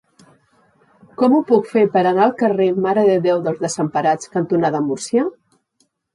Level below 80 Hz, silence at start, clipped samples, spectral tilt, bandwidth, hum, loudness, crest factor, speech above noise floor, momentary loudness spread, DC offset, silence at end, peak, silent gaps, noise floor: -66 dBFS; 1.2 s; under 0.1%; -6 dB/octave; 11.5 kHz; none; -17 LUFS; 16 dB; 49 dB; 6 LU; under 0.1%; 0.85 s; -2 dBFS; none; -65 dBFS